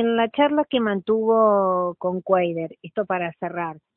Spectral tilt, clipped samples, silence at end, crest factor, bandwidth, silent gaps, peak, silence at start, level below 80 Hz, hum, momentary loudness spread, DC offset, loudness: -10.5 dB/octave; under 0.1%; 0.2 s; 16 dB; 4.1 kHz; none; -6 dBFS; 0 s; -66 dBFS; none; 11 LU; under 0.1%; -22 LUFS